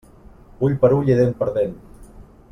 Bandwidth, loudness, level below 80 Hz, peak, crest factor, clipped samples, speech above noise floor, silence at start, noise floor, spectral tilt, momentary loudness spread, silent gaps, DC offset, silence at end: 10 kHz; -19 LUFS; -44 dBFS; -2 dBFS; 18 dB; under 0.1%; 28 dB; 0.25 s; -45 dBFS; -9.5 dB/octave; 8 LU; none; under 0.1%; 0.3 s